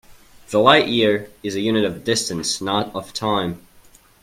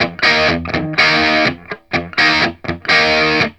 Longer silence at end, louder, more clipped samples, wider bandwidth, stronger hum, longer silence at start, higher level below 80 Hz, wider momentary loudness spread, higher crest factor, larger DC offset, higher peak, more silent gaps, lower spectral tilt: first, 0.65 s vs 0.05 s; second, -19 LUFS vs -13 LUFS; neither; first, 16.5 kHz vs 11 kHz; neither; about the same, 0.1 s vs 0 s; second, -54 dBFS vs -40 dBFS; first, 13 LU vs 10 LU; first, 20 dB vs 14 dB; second, under 0.1% vs 0.2%; about the same, 0 dBFS vs 0 dBFS; neither; about the same, -3.5 dB/octave vs -4 dB/octave